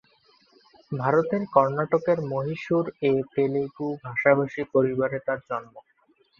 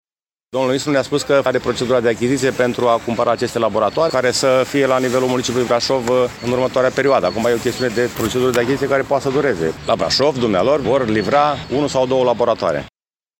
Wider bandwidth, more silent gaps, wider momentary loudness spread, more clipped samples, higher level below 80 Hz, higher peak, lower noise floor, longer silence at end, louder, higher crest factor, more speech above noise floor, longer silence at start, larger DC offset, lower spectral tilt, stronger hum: second, 7 kHz vs 17 kHz; neither; first, 9 LU vs 4 LU; neither; second, -64 dBFS vs -46 dBFS; about the same, -4 dBFS vs -2 dBFS; first, -64 dBFS vs -60 dBFS; about the same, 0.6 s vs 0.5 s; second, -25 LUFS vs -17 LUFS; first, 22 dB vs 14 dB; second, 39 dB vs 44 dB; first, 0.9 s vs 0.55 s; neither; first, -8.5 dB/octave vs -4.5 dB/octave; neither